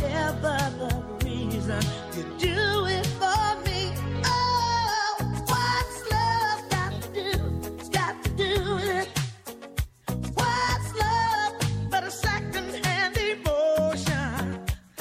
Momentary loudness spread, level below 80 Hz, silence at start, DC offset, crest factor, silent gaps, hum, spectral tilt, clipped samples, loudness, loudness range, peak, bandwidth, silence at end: 7 LU; -40 dBFS; 0 s; under 0.1%; 16 dB; none; none; -4.5 dB/octave; under 0.1%; -27 LUFS; 3 LU; -12 dBFS; 16 kHz; 0 s